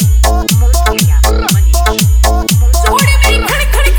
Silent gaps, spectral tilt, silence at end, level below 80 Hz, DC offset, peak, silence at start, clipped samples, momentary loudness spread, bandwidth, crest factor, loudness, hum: none; -4 dB/octave; 0 s; -10 dBFS; 0.2%; 0 dBFS; 0 s; under 0.1%; 2 LU; over 20 kHz; 8 dB; -10 LUFS; none